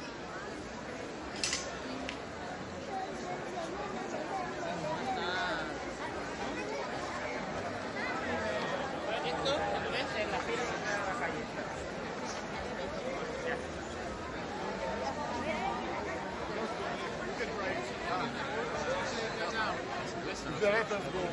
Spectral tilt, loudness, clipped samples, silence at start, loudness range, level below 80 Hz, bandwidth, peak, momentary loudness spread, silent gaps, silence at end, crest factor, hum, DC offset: -4 dB/octave; -36 LUFS; under 0.1%; 0 s; 4 LU; -58 dBFS; 11.5 kHz; -16 dBFS; 6 LU; none; 0 s; 20 dB; none; under 0.1%